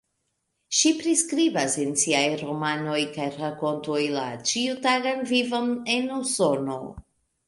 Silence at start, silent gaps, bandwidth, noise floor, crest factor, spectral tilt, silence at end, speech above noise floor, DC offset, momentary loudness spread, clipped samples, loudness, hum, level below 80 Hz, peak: 0.7 s; none; 11.5 kHz; -76 dBFS; 18 dB; -2.5 dB/octave; 0.45 s; 51 dB; under 0.1%; 8 LU; under 0.1%; -24 LUFS; none; -62 dBFS; -6 dBFS